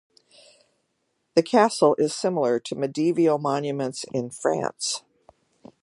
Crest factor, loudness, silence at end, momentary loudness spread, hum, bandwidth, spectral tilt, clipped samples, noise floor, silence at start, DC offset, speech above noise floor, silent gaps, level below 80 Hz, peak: 20 dB; -24 LUFS; 0.85 s; 9 LU; none; 11.5 kHz; -4.5 dB/octave; under 0.1%; -74 dBFS; 1.35 s; under 0.1%; 51 dB; none; -74 dBFS; -4 dBFS